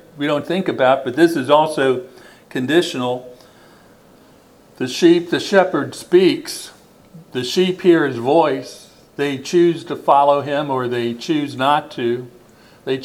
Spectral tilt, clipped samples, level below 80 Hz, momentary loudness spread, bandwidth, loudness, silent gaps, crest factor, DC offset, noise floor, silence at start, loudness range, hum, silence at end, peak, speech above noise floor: -5.5 dB/octave; under 0.1%; -62 dBFS; 13 LU; 14.5 kHz; -17 LUFS; none; 18 dB; under 0.1%; -48 dBFS; 0.15 s; 3 LU; none; 0 s; 0 dBFS; 32 dB